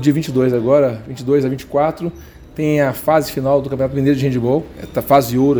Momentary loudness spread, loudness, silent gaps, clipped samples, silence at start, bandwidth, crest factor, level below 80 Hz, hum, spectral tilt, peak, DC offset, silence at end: 10 LU; -17 LUFS; none; under 0.1%; 0 s; over 20 kHz; 16 dB; -44 dBFS; none; -7 dB/octave; 0 dBFS; under 0.1%; 0 s